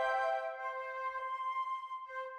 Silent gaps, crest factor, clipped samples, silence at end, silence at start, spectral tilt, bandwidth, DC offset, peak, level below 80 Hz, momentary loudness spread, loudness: none; 16 dB; under 0.1%; 0 s; 0 s; -0.5 dB/octave; 11.5 kHz; under 0.1%; -22 dBFS; -80 dBFS; 8 LU; -38 LUFS